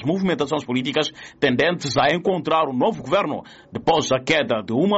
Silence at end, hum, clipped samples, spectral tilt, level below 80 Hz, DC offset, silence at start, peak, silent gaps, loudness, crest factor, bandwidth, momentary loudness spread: 0 s; none; under 0.1%; -3.5 dB/octave; -56 dBFS; under 0.1%; 0 s; -8 dBFS; none; -21 LUFS; 14 dB; 8 kHz; 6 LU